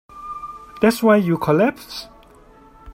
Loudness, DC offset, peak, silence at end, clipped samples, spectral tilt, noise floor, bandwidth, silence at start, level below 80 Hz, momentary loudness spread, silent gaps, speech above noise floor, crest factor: -17 LUFS; under 0.1%; -2 dBFS; 0 s; under 0.1%; -6.5 dB/octave; -47 dBFS; 16.5 kHz; 0.15 s; -52 dBFS; 18 LU; none; 31 dB; 18 dB